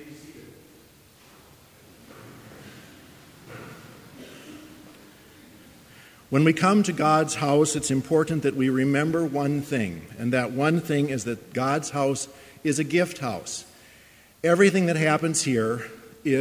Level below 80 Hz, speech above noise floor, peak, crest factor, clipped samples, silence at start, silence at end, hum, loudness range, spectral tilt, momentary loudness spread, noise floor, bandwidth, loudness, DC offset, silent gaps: -60 dBFS; 30 dB; -4 dBFS; 22 dB; under 0.1%; 0 s; 0 s; none; 23 LU; -5 dB/octave; 24 LU; -53 dBFS; 16 kHz; -24 LUFS; under 0.1%; none